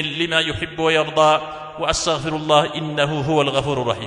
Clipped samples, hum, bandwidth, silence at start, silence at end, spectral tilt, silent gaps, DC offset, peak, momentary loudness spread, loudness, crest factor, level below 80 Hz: under 0.1%; none; 11 kHz; 0 s; 0 s; -4 dB/octave; none; under 0.1%; 0 dBFS; 7 LU; -19 LUFS; 20 dB; -44 dBFS